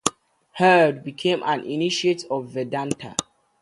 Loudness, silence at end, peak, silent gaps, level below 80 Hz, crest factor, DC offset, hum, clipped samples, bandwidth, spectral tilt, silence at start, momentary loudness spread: -22 LUFS; 0.4 s; 0 dBFS; none; -66 dBFS; 22 dB; under 0.1%; none; under 0.1%; 11.5 kHz; -4 dB/octave; 0.05 s; 12 LU